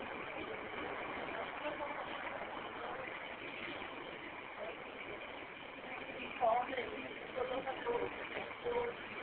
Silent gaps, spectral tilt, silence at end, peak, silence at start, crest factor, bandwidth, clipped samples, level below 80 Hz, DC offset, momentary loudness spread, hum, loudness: none; -1.5 dB/octave; 0 s; -24 dBFS; 0 s; 20 dB; 4.5 kHz; under 0.1%; -68 dBFS; under 0.1%; 9 LU; none; -42 LUFS